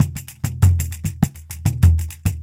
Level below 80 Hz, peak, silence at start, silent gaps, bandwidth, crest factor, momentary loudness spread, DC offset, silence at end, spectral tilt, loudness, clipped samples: -26 dBFS; 0 dBFS; 0 s; none; 16.5 kHz; 18 dB; 9 LU; under 0.1%; 0 s; -6 dB/octave; -20 LUFS; under 0.1%